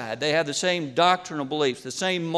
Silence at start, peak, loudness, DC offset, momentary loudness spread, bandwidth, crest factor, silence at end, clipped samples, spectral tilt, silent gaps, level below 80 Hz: 0 s; -6 dBFS; -24 LUFS; under 0.1%; 5 LU; 13 kHz; 18 dB; 0 s; under 0.1%; -3.5 dB/octave; none; -70 dBFS